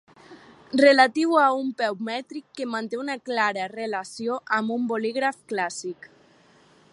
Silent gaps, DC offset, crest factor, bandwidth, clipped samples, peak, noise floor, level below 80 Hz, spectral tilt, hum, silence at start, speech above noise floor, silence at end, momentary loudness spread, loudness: none; under 0.1%; 22 dB; 11.5 kHz; under 0.1%; -4 dBFS; -57 dBFS; -78 dBFS; -3.5 dB/octave; none; 0.3 s; 33 dB; 1 s; 14 LU; -24 LUFS